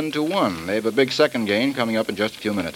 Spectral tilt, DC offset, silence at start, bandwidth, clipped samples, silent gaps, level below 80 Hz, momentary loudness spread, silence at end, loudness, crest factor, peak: -5 dB/octave; under 0.1%; 0 s; 17 kHz; under 0.1%; none; -58 dBFS; 5 LU; 0 s; -21 LUFS; 18 dB; -4 dBFS